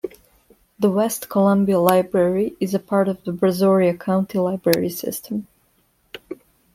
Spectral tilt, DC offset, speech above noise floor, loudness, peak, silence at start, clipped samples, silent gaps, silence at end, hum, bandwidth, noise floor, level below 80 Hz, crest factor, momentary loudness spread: -6.5 dB/octave; under 0.1%; 44 dB; -20 LUFS; 0 dBFS; 0.05 s; under 0.1%; none; 0.4 s; none; 16.5 kHz; -63 dBFS; -58 dBFS; 20 dB; 19 LU